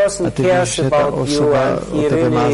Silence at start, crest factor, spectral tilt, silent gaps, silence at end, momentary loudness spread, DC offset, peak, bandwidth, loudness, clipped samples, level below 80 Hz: 0 s; 8 dB; -5.5 dB/octave; none; 0 s; 3 LU; under 0.1%; -6 dBFS; 11.5 kHz; -16 LUFS; under 0.1%; -40 dBFS